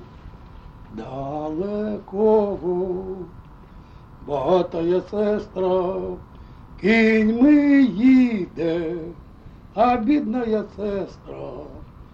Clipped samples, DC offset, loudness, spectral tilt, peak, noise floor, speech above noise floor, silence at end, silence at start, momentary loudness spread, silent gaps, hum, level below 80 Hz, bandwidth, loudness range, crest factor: under 0.1%; under 0.1%; -20 LUFS; -8 dB/octave; -6 dBFS; -43 dBFS; 23 dB; 0.1 s; 0 s; 20 LU; none; none; -46 dBFS; 7.2 kHz; 7 LU; 16 dB